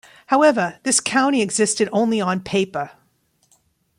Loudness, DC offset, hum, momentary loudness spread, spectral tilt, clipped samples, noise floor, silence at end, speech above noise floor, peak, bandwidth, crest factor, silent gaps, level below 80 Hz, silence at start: -19 LUFS; under 0.1%; none; 7 LU; -3.5 dB/octave; under 0.1%; -64 dBFS; 1.1 s; 45 dB; -4 dBFS; 16 kHz; 16 dB; none; -62 dBFS; 0.3 s